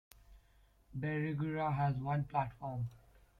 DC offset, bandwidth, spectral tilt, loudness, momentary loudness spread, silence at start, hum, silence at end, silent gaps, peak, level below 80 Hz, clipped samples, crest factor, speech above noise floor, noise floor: under 0.1%; 4.9 kHz; -9 dB/octave; -38 LUFS; 8 LU; 0.3 s; none; 0.4 s; none; -20 dBFS; -62 dBFS; under 0.1%; 18 dB; 31 dB; -68 dBFS